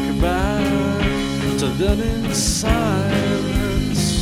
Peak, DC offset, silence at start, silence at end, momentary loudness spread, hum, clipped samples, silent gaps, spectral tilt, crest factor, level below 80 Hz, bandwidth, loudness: -4 dBFS; under 0.1%; 0 s; 0 s; 2 LU; none; under 0.1%; none; -5 dB/octave; 14 dB; -26 dBFS; 16.5 kHz; -19 LUFS